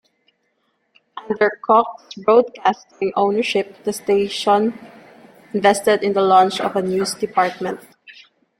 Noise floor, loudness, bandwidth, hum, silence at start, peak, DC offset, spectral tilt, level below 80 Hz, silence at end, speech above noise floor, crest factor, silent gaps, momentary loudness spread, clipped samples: -68 dBFS; -18 LUFS; 16 kHz; none; 1.15 s; -2 dBFS; under 0.1%; -4.5 dB/octave; -64 dBFS; 0.5 s; 50 dB; 18 dB; none; 13 LU; under 0.1%